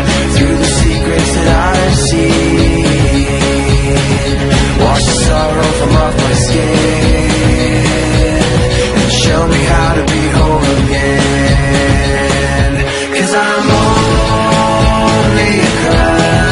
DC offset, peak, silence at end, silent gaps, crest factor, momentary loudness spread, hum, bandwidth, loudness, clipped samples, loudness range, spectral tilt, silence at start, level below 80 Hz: under 0.1%; 0 dBFS; 0 s; none; 10 dB; 2 LU; none; 11.5 kHz; -10 LUFS; under 0.1%; 1 LU; -5 dB/octave; 0 s; -18 dBFS